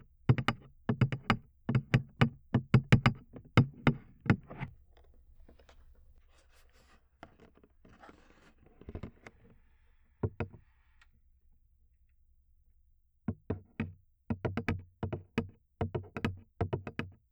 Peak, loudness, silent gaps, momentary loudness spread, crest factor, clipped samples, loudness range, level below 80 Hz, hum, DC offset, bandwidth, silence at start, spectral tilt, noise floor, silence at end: -12 dBFS; -34 LUFS; none; 17 LU; 24 dB; under 0.1%; 23 LU; -52 dBFS; none; under 0.1%; 9.4 kHz; 0.3 s; -7.5 dB/octave; -68 dBFS; 0.2 s